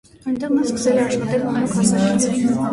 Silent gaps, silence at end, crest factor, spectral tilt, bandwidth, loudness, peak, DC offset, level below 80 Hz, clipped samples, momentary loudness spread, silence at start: none; 0 s; 14 dB; -5.5 dB/octave; 11.5 kHz; -19 LUFS; -4 dBFS; under 0.1%; -50 dBFS; under 0.1%; 4 LU; 0.25 s